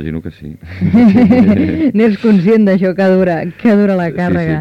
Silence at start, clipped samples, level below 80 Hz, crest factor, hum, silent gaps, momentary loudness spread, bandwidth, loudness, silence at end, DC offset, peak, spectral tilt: 0 s; under 0.1%; -40 dBFS; 10 dB; none; none; 14 LU; 6 kHz; -11 LUFS; 0 s; under 0.1%; 0 dBFS; -9.5 dB/octave